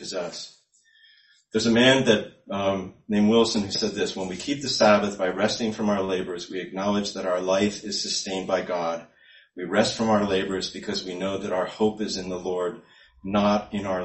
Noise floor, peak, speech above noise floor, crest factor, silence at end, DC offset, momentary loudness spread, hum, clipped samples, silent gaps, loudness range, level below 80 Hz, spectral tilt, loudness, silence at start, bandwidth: -60 dBFS; -2 dBFS; 35 dB; 22 dB; 0 s; under 0.1%; 12 LU; none; under 0.1%; none; 4 LU; -56 dBFS; -4 dB/octave; -24 LUFS; 0 s; 8.6 kHz